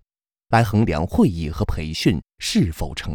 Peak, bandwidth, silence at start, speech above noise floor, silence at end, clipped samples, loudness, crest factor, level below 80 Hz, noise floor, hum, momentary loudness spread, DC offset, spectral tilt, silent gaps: -4 dBFS; over 20 kHz; 0.5 s; 51 dB; 0 s; under 0.1%; -21 LUFS; 18 dB; -34 dBFS; -71 dBFS; none; 7 LU; under 0.1%; -6 dB/octave; none